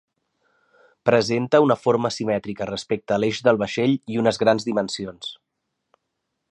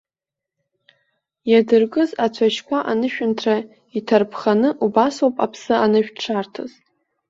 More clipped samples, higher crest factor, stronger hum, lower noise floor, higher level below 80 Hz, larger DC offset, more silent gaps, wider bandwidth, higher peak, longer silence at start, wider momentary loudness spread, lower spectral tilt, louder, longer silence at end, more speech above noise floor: neither; about the same, 20 dB vs 18 dB; neither; second, -78 dBFS vs -87 dBFS; about the same, -60 dBFS vs -64 dBFS; neither; neither; first, 10.5 kHz vs 7.8 kHz; about the same, -2 dBFS vs -2 dBFS; second, 1.05 s vs 1.45 s; about the same, 11 LU vs 11 LU; about the same, -5.5 dB/octave vs -5.5 dB/octave; about the same, -21 LUFS vs -19 LUFS; first, 1.15 s vs 0.6 s; second, 57 dB vs 69 dB